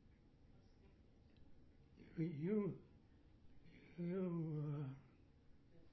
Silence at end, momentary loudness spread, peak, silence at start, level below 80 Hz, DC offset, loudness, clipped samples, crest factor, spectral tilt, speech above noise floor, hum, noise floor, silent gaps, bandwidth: 0 s; 19 LU; -30 dBFS; 0.05 s; -72 dBFS; under 0.1%; -46 LUFS; under 0.1%; 18 dB; -10 dB/octave; 25 dB; none; -68 dBFS; none; 5.8 kHz